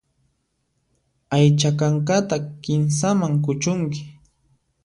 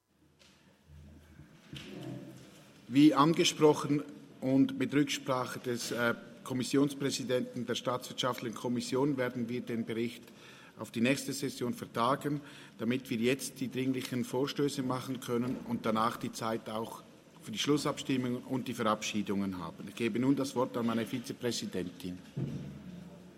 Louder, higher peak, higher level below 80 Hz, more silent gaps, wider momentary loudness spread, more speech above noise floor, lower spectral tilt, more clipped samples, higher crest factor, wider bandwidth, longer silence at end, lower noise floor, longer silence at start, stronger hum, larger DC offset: first, -20 LUFS vs -33 LUFS; first, -6 dBFS vs -12 dBFS; first, -58 dBFS vs -72 dBFS; neither; second, 9 LU vs 15 LU; first, 51 dB vs 32 dB; about the same, -6 dB/octave vs -5 dB/octave; neither; second, 16 dB vs 22 dB; second, 11 kHz vs 16 kHz; first, 0.75 s vs 0.05 s; first, -71 dBFS vs -65 dBFS; first, 1.3 s vs 0.9 s; neither; neither